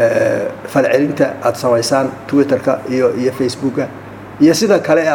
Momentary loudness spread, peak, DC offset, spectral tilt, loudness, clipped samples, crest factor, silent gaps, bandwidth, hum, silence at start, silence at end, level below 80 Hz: 8 LU; 0 dBFS; under 0.1%; -5 dB/octave; -15 LUFS; under 0.1%; 14 dB; none; 19 kHz; none; 0 s; 0 s; -56 dBFS